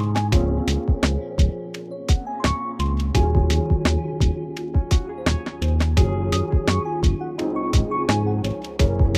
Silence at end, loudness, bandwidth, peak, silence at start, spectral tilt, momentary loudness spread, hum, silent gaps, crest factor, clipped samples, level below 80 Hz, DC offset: 0 s; -22 LUFS; 13 kHz; -4 dBFS; 0 s; -6.5 dB/octave; 6 LU; none; none; 16 dB; under 0.1%; -24 dBFS; under 0.1%